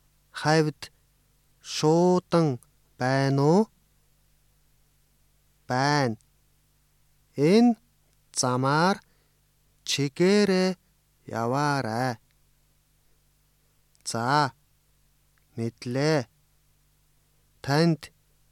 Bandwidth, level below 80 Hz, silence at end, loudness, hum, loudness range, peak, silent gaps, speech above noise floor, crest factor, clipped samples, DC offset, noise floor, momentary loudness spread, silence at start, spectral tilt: 15 kHz; -66 dBFS; 0.45 s; -25 LUFS; 50 Hz at -60 dBFS; 7 LU; -8 dBFS; none; 42 dB; 20 dB; under 0.1%; under 0.1%; -66 dBFS; 18 LU; 0.35 s; -5.5 dB/octave